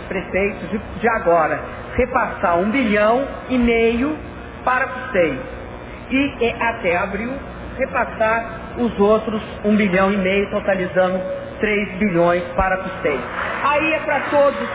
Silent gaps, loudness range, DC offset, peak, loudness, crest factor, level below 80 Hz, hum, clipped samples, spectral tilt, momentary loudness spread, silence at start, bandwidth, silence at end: none; 3 LU; under 0.1%; -4 dBFS; -19 LUFS; 14 dB; -38 dBFS; none; under 0.1%; -10 dB/octave; 10 LU; 0 s; 4 kHz; 0 s